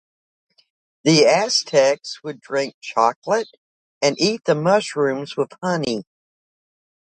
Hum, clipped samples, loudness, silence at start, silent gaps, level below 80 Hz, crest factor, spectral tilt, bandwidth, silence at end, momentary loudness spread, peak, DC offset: none; under 0.1%; -19 LUFS; 1.05 s; 2.74-2.81 s, 3.16-3.22 s, 3.58-4.01 s; -68 dBFS; 20 dB; -4 dB/octave; 9.4 kHz; 1.1 s; 11 LU; -2 dBFS; under 0.1%